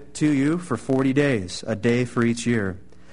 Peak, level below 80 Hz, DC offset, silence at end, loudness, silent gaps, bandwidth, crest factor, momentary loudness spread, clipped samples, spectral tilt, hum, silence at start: -8 dBFS; -52 dBFS; 0.8%; 0.3 s; -23 LUFS; none; 11 kHz; 16 dB; 7 LU; under 0.1%; -6 dB/octave; none; 0 s